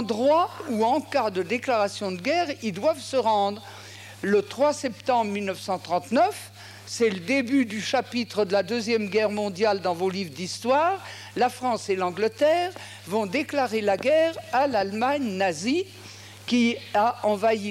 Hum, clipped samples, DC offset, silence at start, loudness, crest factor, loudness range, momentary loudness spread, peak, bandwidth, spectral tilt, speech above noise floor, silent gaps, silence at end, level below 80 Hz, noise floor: none; under 0.1%; under 0.1%; 0 s; -25 LUFS; 14 dB; 1 LU; 9 LU; -12 dBFS; 16 kHz; -4.5 dB/octave; 19 dB; none; 0 s; -70 dBFS; -44 dBFS